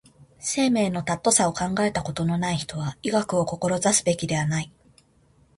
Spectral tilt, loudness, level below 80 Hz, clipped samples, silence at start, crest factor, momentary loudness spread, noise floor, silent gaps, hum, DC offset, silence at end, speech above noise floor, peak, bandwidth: -4 dB/octave; -24 LUFS; -54 dBFS; under 0.1%; 0.2 s; 20 dB; 8 LU; -60 dBFS; none; none; under 0.1%; 0.9 s; 36 dB; -4 dBFS; 11.5 kHz